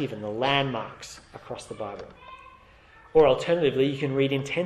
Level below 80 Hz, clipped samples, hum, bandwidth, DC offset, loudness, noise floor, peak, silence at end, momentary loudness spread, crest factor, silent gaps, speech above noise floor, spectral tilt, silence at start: -56 dBFS; under 0.1%; none; 12.5 kHz; under 0.1%; -25 LUFS; -53 dBFS; -8 dBFS; 0 s; 22 LU; 18 dB; none; 28 dB; -5.5 dB/octave; 0 s